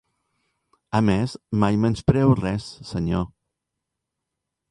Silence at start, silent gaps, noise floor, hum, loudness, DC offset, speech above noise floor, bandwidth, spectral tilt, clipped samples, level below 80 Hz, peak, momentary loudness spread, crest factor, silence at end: 0.95 s; none; -83 dBFS; none; -22 LUFS; under 0.1%; 61 dB; 11.5 kHz; -7.5 dB/octave; under 0.1%; -44 dBFS; -4 dBFS; 10 LU; 20 dB; 1.45 s